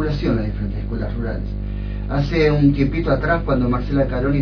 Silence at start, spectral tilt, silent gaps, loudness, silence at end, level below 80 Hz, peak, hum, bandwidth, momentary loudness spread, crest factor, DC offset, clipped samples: 0 s; -9 dB/octave; none; -20 LUFS; 0 s; -26 dBFS; -4 dBFS; 50 Hz at -25 dBFS; 5.4 kHz; 11 LU; 16 dB; under 0.1%; under 0.1%